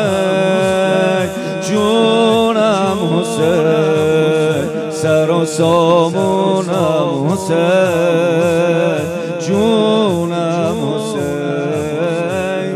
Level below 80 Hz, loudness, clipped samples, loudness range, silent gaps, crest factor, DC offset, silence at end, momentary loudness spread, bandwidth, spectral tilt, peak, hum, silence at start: -56 dBFS; -14 LUFS; under 0.1%; 2 LU; none; 12 dB; under 0.1%; 0 s; 6 LU; 15 kHz; -5.5 dB/octave; -2 dBFS; none; 0 s